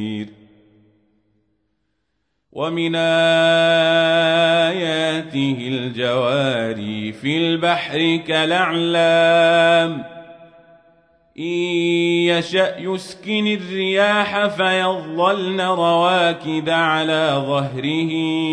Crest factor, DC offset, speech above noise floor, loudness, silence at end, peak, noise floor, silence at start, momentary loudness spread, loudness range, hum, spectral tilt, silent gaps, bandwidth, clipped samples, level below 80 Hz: 14 dB; under 0.1%; 55 dB; -18 LUFS; 0 s; -4 dBFS; -72 dBFS; 0 s; 10 LU; 4 LU; none; -5 dB/octave; none; 10.5 kHz; under 0.1%; -64 dBFS